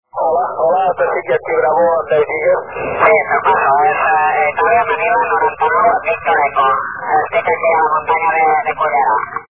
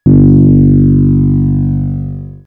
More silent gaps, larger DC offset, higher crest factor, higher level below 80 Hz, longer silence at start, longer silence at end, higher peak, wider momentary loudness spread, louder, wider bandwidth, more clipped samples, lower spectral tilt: neither; first, 0.4% vs under 0.1%; first, 14 dB vs 8 dB; second, -50 dBFS vs -22 dBFS; about the same, 0.15 s vs 0.05 s; second, 0.05 s vs 0.2 s; about the same, 0 dBFS vs 0 dBFS; second, 4 LU vs 12 LU; second, -14 LUFS vs -9 LUFS; first, 3.7 kHz vs 1.6 kHz; neither; second, -7.5 dB/octave vs -14.5 dB/octave